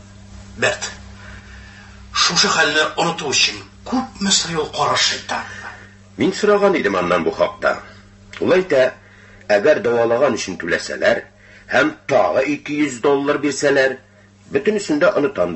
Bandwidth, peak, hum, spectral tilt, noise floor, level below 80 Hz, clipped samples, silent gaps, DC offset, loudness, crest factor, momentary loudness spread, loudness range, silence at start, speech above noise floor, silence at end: 8.6 kHz; -2 dBFS; none; -3 dB/octave; -40 dBFS; -48 dBFS; under 0.1%; none; under 0.1%; -17 LUFS; 16 dB; 14 LU; 2 LU; 0.05 s; 22 dB; 0 s